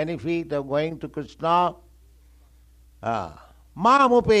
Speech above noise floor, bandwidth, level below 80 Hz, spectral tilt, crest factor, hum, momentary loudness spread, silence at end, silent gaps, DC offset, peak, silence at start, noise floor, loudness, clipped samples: 31 dB; 11 kHz; -50 dBFS; -6 dB/octave; 18 dB; none; 16 LU; 0 s; none; under 0.1%; -6 dBFS; 0 s; -53 dBFS; -23 LUFS; under 0.1%